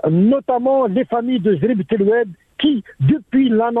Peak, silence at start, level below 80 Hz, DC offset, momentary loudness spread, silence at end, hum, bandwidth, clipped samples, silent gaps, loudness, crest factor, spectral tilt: -6 dBFS; 0.05 s; -52 dBFS; under 0.1%; 4 LU; 0 s; none; 4 kHz; under 0.1%; none; -17 LUFS; 10 dB; -10 dB/octave